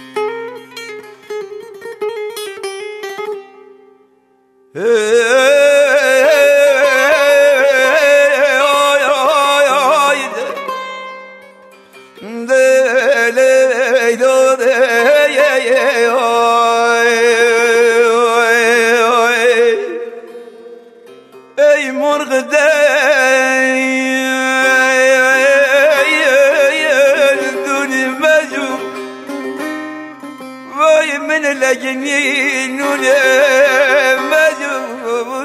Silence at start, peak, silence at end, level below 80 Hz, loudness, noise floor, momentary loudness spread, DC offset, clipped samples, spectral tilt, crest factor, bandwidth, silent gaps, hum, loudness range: 0 s; 0 dBFS; 0 s; -68 dBFS; -11 LUFS; -53 dBFS; 16 LU; under 0.1%; under 0.1%; -1 dB/octave; 12 dB; 15.5 kHz; none; none; 7 LU